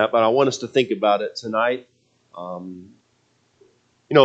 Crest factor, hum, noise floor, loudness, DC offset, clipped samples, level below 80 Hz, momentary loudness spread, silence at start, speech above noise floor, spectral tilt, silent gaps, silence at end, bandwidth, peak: 22 dB; none; -64 dBFS; -21 LUFS; under 0.1%; under 0.1%; -74 dBFS; 18 LU; 0 s; 43 dB; -5 dB/octave; none; 0 s; 8.4 kHz; 0 dBFS